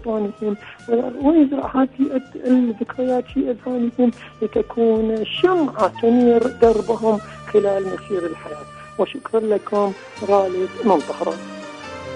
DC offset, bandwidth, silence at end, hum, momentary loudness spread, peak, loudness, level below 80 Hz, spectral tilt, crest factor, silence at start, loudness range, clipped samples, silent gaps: under 0.1%; 10.5 kHz; 0 s; none; 12 LU; -4 dBFS; -20 LUFS; -50 dBFS; -6.5 dB/octave; 16 dB; 0 s; 4 LU; under 0.1%; none